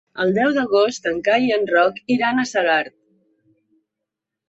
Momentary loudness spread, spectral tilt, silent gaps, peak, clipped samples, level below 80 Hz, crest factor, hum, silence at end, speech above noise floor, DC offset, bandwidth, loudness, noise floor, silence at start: 4 LU; -4.5 dB/octave; none; -4 dBFS; under 0.1%; -62 dBFS; 16 dB; none; 1.6 s; 64 dB; under 0.1%; 8 kHz; -18 LUFS; -83 dBFS; 0.15 s